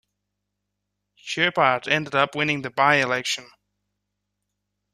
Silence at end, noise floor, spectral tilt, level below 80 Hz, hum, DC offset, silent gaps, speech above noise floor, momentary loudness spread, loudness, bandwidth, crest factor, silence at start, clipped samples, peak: 1.5 s; -80 dBFS; -3.5 dB/octave; -66 dBFS; 50 Hz at -50 dBFS; under 0.1%; none; 58 dB; 10 LU; -21 LUFS; 14.5 kHz; 22 dB; 1.25 s; under 0.1%; -4 dBFS